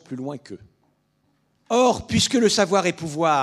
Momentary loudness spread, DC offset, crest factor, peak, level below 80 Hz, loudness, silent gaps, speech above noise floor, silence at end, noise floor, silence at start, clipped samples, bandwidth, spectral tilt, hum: 15 LU; under 0.1%; 18 dB; -4 dBFS; -52 dBFS; -20 LUFS; none; 46 dB; 0 s; -67 dBFS; 0.1 s; under 0.1%; 14 kHz; -4 dB/octave; none